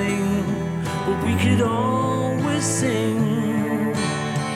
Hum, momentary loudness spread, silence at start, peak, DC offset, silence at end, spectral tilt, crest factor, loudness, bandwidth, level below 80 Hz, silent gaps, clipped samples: none; 5 LU; 0 s; -6 dBFS; under 0.1%; 0 s; -5.5 dB/octave; 14 dB; -22 LUFS; 15.5 kHz; -48 dBFS; none; under 0.1%